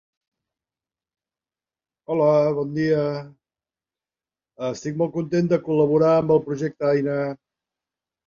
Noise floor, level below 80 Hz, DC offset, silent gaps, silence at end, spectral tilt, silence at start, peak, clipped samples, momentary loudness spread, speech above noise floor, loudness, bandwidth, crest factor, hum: under -90 dBFS; -62 dBFS; under 0.1%; none; 0.9 s; -8 dB/octave; 2.1 s; -6 dBFS; under 0.1%; 12 LU; over 69 dB; -22 LUFS; 7.4 kHz; 18 dB; none